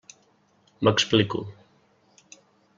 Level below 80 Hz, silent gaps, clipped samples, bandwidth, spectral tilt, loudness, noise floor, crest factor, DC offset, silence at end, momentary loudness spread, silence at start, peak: -62 dBFS; none; under 0.1%; 7.6 kHz; -4.5 dB/octave; -23 LUFS; -63 dBFS; 24 dB; under 0.1%; 1.25 s; 14 LU; 0.8 s; -4 dBFS